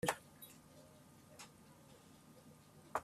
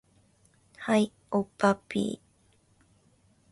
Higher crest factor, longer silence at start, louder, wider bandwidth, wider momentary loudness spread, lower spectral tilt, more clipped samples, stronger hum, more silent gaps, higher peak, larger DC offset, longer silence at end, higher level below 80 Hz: first, 30 dB vs 22 dB; second, 0 s vs 0.8 s; second, -54 LUFS vs -29 LUFS; first, 15.5 kHz vs 11.5 kHz; first, 15 LU vs 11 LU; second, -3.5 dB/octave vs -6 dB/octave; neither; neither; neither; second, -20 dBFS vs -10 dBFS; neither; second, 0 s vs 1.35 s; second, -76 dBFS vs -66 dBFS